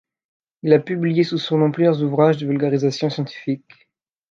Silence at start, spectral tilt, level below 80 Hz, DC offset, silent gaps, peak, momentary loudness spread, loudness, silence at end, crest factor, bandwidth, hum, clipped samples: 0.65 s; -7.5 dB/octave; -68 dBFS; under 0.1%; none; -2 dBFS; 10 LU; -19 LUFS; 0.75 s; 18 dB; 7.4 kHz; none; under 0.1%